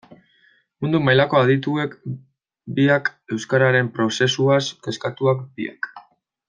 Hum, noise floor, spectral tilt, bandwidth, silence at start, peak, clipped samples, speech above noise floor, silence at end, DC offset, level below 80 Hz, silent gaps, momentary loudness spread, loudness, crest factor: none; -59 dBFS; -5.5 dB/octave; 9.4 kHz; 0.8 s; -2 dBFS; under 0.1%; 40 dB; 0.5 s; under 0.1%; -62 dBFS; none; 14 LU; -20 LUFS; 18 dB